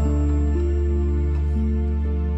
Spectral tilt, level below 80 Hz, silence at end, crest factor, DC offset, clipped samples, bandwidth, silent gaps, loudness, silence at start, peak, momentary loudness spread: -9.5 dB/octave; -22 dBFS; 0 s; 8 dB; under 0.1%; under 0.1%; 8 kHz; none; -23 LUFS; 0 s; -12 dBFS; 2 LU